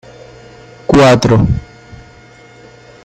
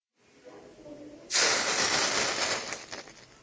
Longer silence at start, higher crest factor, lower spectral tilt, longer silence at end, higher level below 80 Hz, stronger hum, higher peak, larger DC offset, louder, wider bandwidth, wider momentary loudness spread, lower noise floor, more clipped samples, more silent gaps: first, 0.9 s vs 0.45 s; second, 14 dB vs 20 dB; first, -6.5 dB/octave vs 0 dB/octave; first, 1.4 s vs 0.2 s; first, -32 dBFS vs -64 dBFS; neither; first, 0 dBFS vs -12 dBFS; neither; first, -10 LUFS vs -26 LUFS; first, 14.5 kHz vs 8 kHz; second, 13 LU vs 23 LU; second, -40 dBFS vs -56 dBFS; neither; neither